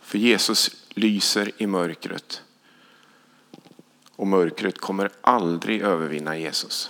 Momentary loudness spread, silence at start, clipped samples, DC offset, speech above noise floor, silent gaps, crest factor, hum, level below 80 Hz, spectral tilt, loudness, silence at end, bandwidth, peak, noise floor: 11 LU; 0.05 s; under 0.1%; under 0.1%; 33 dB; none; 24 dB; 50 Hz at -70 dBFS; -76 dBFS; -3.5 dB/octave; -23 LUFS; 0 s; 19.5 kHz; -2 dBFS; -56 dBFS